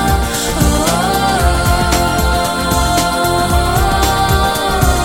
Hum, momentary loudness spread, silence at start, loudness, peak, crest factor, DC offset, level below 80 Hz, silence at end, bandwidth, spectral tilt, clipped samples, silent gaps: none; 2 LU; 0 s; -13 LUFS; 0 dBFS; 12 dB; under 0.1%; -18 dBFS; 0 s; 18 kHz; -4 dB/octave; under 0.1%; none